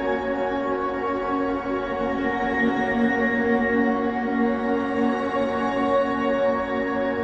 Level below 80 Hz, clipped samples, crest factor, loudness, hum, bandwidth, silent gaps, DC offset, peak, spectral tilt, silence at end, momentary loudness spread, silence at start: -48 dBFS; under 0.1%; 14 dB; -23 LUFS; none; 7.4 kHz; none; under 0.1%; -8 dBFS; -6.5 dB/octave; 0 s; 4 LU; 0 s